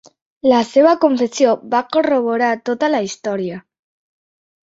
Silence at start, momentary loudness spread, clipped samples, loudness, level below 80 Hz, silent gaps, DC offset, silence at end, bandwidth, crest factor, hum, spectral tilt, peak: 0.45 s; 10 LU; under 0.1%; -16 LUFS; -64 dBFS; none; under 0.1%; 1.1 s; 8 kHz; 16 dB; none; -4.5 dB/octave; -2 dBFS